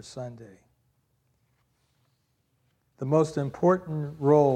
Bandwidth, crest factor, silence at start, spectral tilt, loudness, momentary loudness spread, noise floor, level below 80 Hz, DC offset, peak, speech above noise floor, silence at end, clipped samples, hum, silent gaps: 9.6 kHz; 20 dB; 0.05 s; -8 dB/octave; -25 LUFS; 17 LU; -72 dBFS; -66 dBFS; under 0.1%; -8 dBFS; 48 dB; 0 s; under 0.1%; none; none